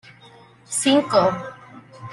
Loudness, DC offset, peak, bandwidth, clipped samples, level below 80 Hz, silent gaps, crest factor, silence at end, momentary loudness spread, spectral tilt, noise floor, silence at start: -20 LUFS; under 0.1%; -4 dBFS; 12.5 kHz; under 0.1%; -62 dBFS; none; 20 dB; 0 s; 20 LU; -3.5 dB/octave; -48 dBFS; 0.7 s